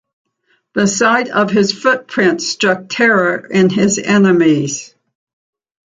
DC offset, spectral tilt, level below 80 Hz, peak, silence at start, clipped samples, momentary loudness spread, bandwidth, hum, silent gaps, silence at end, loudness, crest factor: under 0.1%; -4.5 dB/octave; -56 dBFS; -2 dBFS; 0.75 s; under 0.1%; 5 LU; 9.4 kHz; none; none; 1 s; -13 LUFS; 14 dB